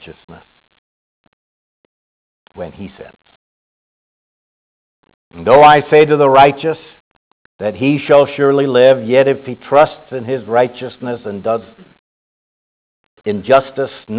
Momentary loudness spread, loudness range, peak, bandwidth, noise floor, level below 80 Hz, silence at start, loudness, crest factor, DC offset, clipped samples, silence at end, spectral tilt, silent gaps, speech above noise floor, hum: 18 LU; 9 LU; 0 dBFS; 4 kHz; under -90 dBFS; -52 dBFS; 0.05 s; -12 LUFS; 16 dB; under 0.1%; under 0.1%; 0 s; -10 dB/octave; 0.24-0.28 s, 0.78-2.46 s, 3.36-5.03 s, 5.14-5.31 s, 7.00-7.59 s, 11.99-13.17 s; over 77 dB; none